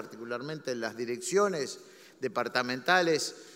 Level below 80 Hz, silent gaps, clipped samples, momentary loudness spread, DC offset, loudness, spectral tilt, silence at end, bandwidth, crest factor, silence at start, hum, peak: -84 dBFS; none; under 0.1%; 13 LU; under 0.1%; -30 LUFS; -3 dB/octave; 0 s; 16 kHz; 22 dB; 0 s; none; -10 dBFS